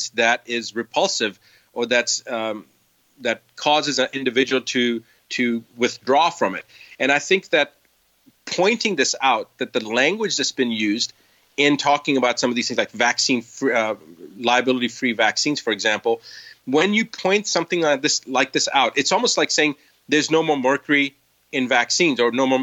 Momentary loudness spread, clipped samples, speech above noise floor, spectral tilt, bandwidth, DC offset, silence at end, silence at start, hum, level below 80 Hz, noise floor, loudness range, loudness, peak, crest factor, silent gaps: 8 LU; under 0.1%; 40 dB; -2.5 dB/octave; 16.5 kHz; under 0.1%; 0 s; 0 s; none; -74 dBFS; -61 dBFS; 3 LU; -20 LUFS; -4 dBFS; 18 dB; none